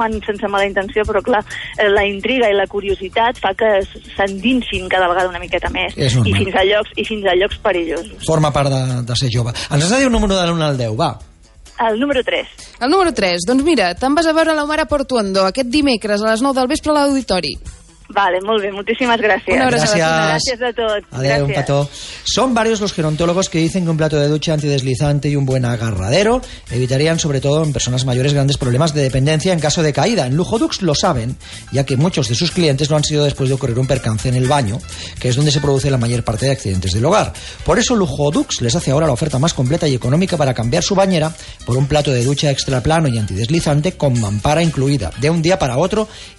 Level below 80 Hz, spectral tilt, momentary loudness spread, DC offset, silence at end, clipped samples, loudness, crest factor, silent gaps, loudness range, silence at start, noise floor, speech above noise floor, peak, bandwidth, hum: -36 dBFS; -5 dB/octave; 5 LU; under 0.1%; 0.05 s; under 0.1%; -16 LUFS; 12 dB; none; 2 LU; 0 s; -37 dBFS; 22 dB; -4 dBFS; 11.5 kHz; none